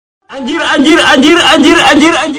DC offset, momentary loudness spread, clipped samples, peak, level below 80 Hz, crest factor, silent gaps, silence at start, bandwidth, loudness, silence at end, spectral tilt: under 0.1%; 10 LU; 5%; 0 dBFS; -40 dBFS; 8 dB; none; 0.3 s; 16 kHz; -5 LUFS; 0 s; -2.5 dB/octave